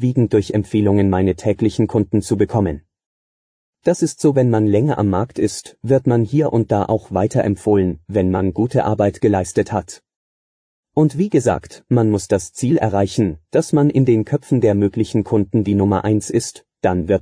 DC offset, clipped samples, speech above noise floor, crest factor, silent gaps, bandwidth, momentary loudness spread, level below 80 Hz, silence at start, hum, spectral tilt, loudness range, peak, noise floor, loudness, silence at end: under 0.1%; under 0.1%; over 74 dB; 12 dB; 3.06-3.73 s, 10.16-10.83 s; 10.5 kHz; 5 LU; -46 dBFS; 0 s; none; -7.5 dB/octave; 3 LU; -4 dBFS; under -90 dBFS; -17 LUFS; 0 s